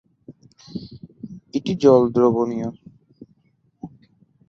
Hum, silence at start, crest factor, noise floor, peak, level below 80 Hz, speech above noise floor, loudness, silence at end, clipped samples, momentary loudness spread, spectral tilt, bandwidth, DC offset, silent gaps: none; 0.3 s; 20 dB; -63 dBFS; -2 dBFS; -58 dBFS; 46 dB; -19 LUFS; 0.6 s; under 0.1%; 26 LU; -8 dB/octave; 7.6 kHz; under 0.1%; none